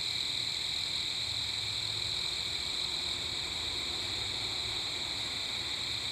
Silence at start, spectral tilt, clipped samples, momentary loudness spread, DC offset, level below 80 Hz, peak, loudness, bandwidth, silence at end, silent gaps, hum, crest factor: 0 s; -1 dB/octave; under 0.1%; 2 LU; under 0.1%; -56 dBFS; -22 dBFS; -32 LUFS; 14 kHz; 0 s; none; none; 14 dB